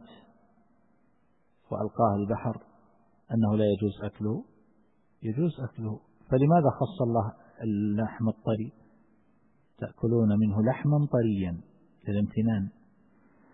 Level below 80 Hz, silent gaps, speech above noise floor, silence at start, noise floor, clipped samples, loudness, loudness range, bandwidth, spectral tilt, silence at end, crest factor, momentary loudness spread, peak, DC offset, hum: -58 dBFS; none; 43 dB; 0.1 s; -70 dBFS; under 0.1%; -28 LUFS; 4 LU; 4 kHz; -12.5 dB/octave; 0.85 s; 18 dB; 14 LU; -10 dBFS; under 0.1%; none